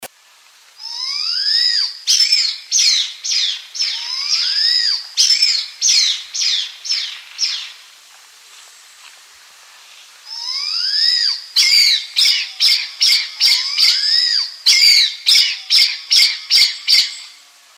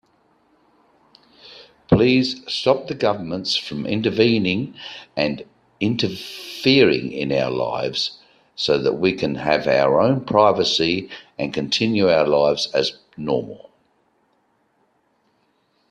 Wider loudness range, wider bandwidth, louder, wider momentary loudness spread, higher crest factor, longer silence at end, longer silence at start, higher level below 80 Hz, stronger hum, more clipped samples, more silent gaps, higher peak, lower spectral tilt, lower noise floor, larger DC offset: first, 12 LU vs 4 LU; first, 17 kHz vs 14.5 kHz; first, -13 LUFS vs -20 LUFS; about the same, 9 LU vs 10 LU; about the same, 16 dB vs 20 dB; second, 0.5 s vs 2.35 s; second, 0 s vs 1.45 s; second, -82 dBFS vs -52 dBFS; neither; neither; neither; about the same, 0 dBFS vs 0 dBFS; second, 7 dB/octave vs -5.5 dB/octave; second, -49 dBFS vs -65 dBFS; neither